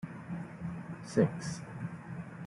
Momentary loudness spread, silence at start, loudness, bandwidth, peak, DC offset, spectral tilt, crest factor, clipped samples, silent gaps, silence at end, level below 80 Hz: 13 LU; 0 s; -37 LUFS; 11.5 kHz; -12 dBFS; under 0.1%; -7 dB/octave; 24 dB; under 0.1%; none; 0 s; -66 dBFS